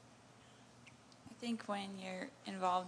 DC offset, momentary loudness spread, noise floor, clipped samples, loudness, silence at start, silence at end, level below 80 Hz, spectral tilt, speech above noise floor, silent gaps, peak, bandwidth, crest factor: under 0.1%; 21 LU; -62 dBFS; under 0.1%; -43 LUFS; 0 s; 0 s; -84 dBFS; -4.5 dB/octave; 21 dB; none; -22 dBFS; 11 kHz; 22 dB